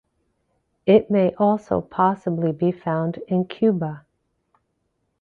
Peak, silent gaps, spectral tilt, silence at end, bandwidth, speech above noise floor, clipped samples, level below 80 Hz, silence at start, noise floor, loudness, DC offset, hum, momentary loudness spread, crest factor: -4 dBFS; none; -9.5 dB/octave; 1.2 s; 6.4 kHz; 52 dB; under 0.1%; -58 dBFS; 0.85 s; -73 dBFS; -21 LUFS; under 0.1%; none; 9 LU; 20 dB